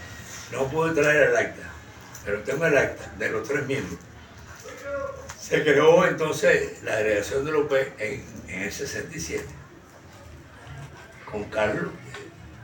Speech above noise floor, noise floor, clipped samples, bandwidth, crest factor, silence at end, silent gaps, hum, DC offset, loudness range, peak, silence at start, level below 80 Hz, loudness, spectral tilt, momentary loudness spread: 24 dB; -47 dBFS; under 0.1%; 17 kHz; 20 dB; 0 s; none; none; under 0.1%; 11 LU; -6 dBFS; 0 s; -54 dBFS; -24 LUFS; -4.5 dB/octave; 23 LU